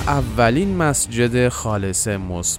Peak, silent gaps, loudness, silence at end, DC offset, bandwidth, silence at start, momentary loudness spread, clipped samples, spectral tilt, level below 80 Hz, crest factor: -4 dBFS; none; -19 LUFS; 0 s; under 0.1%; 16 kHz; 0 s; 5 LU; under 0.1%; -4.5 dB/octave; -34 dBFS; 16 dB